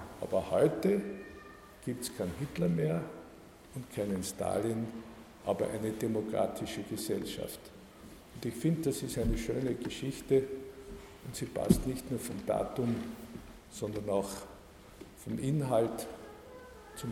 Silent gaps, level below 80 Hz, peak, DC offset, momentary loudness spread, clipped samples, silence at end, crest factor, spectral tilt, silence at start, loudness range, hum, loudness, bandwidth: none; -52 dBFS; -10 dBFS; under 0.1%; 20 LU; under 0.1%; 0 s; 26 dB; -6 dB/octave; 0 s; 3 LU; none; -34 LUFS; 16 kHz